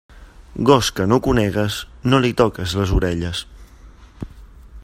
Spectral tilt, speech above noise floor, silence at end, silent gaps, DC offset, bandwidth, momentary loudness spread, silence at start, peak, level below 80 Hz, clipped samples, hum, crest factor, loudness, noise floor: -5.5 dB/octave; 26 dB; 0 s; none; under 0.1%; 16 kHz; 21 LU; 0.15 s; 0 dBFS; -32 dBFS; under 0.1%; none; 20 dB; -18 LUFS; -43 dBFS